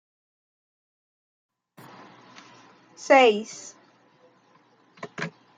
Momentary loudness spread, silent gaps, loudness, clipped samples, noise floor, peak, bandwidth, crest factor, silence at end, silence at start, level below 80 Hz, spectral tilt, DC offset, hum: 26 LU; none; -21 LUFS; under 0.1%; -60 dBFS; -6 dBFS; 9.4 kHz; 24 dB; 0.3 s; 3 s; -82 dBFS; -3.5 dB/octave; under 0.1%; none